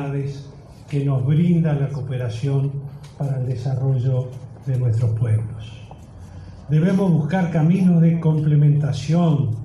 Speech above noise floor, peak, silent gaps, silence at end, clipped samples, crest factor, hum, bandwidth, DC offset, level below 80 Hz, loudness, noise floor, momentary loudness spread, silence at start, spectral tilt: 20 dB; -8 dBFS; none; 0 s; under 0.1%; 12 dB; none; 10 kHz; under 0.1%; -48 dBFS; -20 LUFS; -39 dBFS; 20 LU; 0 s; -9 dB/octave